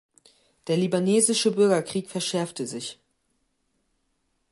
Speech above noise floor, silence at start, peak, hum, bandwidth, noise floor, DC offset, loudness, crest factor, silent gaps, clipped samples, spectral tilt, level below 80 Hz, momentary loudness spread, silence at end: 50 dB; 0.65 s; -8 dBFS; none; 11.5 kHz; -74 dBFS; under 0.1%; -24 LUFS; 20 dB; none; under 0.1%; -4 dB/octave; -72 dBFS; 14 LU; 1.6 s